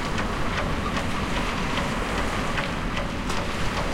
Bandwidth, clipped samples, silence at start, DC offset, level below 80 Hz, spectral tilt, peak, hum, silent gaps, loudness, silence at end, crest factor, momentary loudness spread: 16.5 kHz; under 0.1%; 0 s; under 0.1%; -34 dBFS; -4.5 dB/octave; -12 dBFS; none; none; -27 LUFS; 0 s; 14 dB; 2 LU